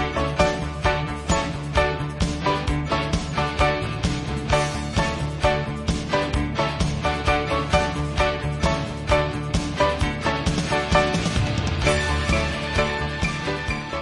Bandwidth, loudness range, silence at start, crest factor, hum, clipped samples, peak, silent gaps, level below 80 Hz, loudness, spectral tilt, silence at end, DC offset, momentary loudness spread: 11.5 kHz; 2 LU; 0 s; 20 dB; none; under 0.1%; -4 dBFS; none; -32 dBFS; -23 LUFS; -5 dB/octave; 0 s; under 0.1%; 4 LU